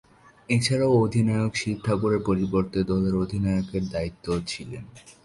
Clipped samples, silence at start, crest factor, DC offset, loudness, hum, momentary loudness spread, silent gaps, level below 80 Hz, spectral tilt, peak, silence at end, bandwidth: under 0.1%; 0.5 s; 16 dB; under 0.1%; -25 LUFS; none; 10 LU; none; -46 dBFS; -6.5 dB/octave; -10 dBFS; 0.15 s; 11.5 kHz